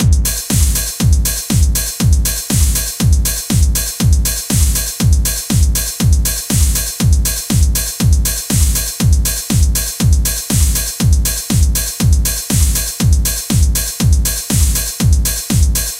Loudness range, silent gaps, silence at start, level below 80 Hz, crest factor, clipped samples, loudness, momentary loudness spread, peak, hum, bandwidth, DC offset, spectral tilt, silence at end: 0 LU; none; 0 s; -16 dBFS; 12 dB; under 0.1%; -14 LUFS; 2 LU; 0 dBFS; none; 16.5 kHz; under 0.1%; -4 dB/octave; 0 s